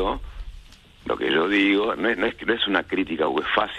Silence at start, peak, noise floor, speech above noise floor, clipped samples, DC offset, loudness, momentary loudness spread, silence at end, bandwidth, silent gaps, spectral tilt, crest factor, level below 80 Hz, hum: 0 s; -6 dBFS; -46 dBFS; 24 dB; under 0.1%; under 0.1%; -22 LUFS; 18 LU; 0 s; 9.4 kHz; none; -5.5 dB/octave; 18 dB; -42 dBFS; none